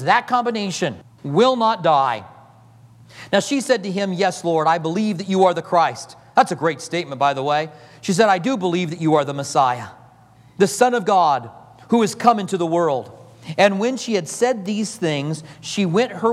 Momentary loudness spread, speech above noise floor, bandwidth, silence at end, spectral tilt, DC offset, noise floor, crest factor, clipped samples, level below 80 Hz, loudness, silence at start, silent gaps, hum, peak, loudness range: 10 LU; 30 dB; 14.5 kHz; 0 s; -5 dB/octave; under 0.1%; -49 dBFS; 18 dB; under 0.1%; -68 dBFS; -19 LUFS; 0 s; none; none; 0 dBFS; 2 LU